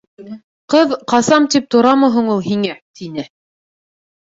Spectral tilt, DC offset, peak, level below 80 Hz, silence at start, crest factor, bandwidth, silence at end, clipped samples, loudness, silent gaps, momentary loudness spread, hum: -4.5 dB/octave; under 0.1%; -2 dBFS; -60 dBFS; 0.2 s; 14 dB; 8 kHz; 1.05 s; under 0.1%; -14 LUFS; 0.44-0.68 s, 2.82-2.94 s; 22 LU; none